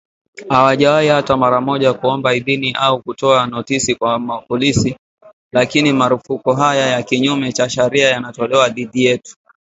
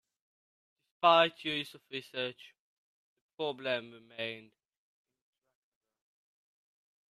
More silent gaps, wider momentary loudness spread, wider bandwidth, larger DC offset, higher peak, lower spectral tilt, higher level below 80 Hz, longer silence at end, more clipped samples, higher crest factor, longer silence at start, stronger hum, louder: second, 4.99-5.18 s, 5.33-5.51 s vs 2.59-3.29 s; second, 5 LU vs 16 LU; second, 8 kHz vs 13.5 kHz; neither; first, 0 dBFS vs -12 dBFS; about the same, -4.5 dB/octave vs -4.5 dB/octave; first, -48 dBFS vs -84 dBFS; second, 0.4 s vs 2.65 s; neither; second, 16 dB vs 26 dB; second, 0.35 s vs 1 s; neither; first, -15 LUFS vs -32 LUFS